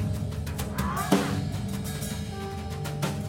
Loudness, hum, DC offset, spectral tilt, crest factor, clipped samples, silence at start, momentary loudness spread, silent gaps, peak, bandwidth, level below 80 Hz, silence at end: -30 LUFS; none; under 0.1%; -5.5 dB/octave; 22 dB; under 0.1%; 0 s; 9 LU; none; -6 dBFS; 17 kHz; -42 dBFS; 0 s